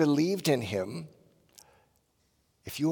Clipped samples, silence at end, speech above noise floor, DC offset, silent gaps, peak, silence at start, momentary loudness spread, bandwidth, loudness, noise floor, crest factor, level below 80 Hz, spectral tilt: under 0.1%; 0 s; 44 dB; under 0.1%; none; -12 dBFS; 0 s; 21 LU; 18 kHz; -30 LUFS; -72 dBFS; 18 dB; -72 dBFS; -5.5 dB/octave